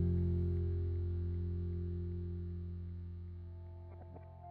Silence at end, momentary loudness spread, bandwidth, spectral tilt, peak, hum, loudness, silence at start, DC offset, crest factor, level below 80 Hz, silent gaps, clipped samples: 0 s; 16 LU; 3.9 kHz; -12 dB/octave; -26 dBFS; 60 Hz at -65 dBFS; -40 LUFS; 0 s; under 0.1%; 12 dB; -52 dBFS; none; under 0.1%